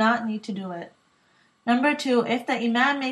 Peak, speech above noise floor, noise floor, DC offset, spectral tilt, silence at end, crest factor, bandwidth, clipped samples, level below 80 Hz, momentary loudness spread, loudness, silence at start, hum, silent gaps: -8 dBFS; 39 dB; -63 dBFS; under 0.1%; -4.5 dB/octave; 0 s; 18 dB; 12 kHz; under 0.1%; -80 dBFS; 13 LU; -24 LUFS; 0 s; none; none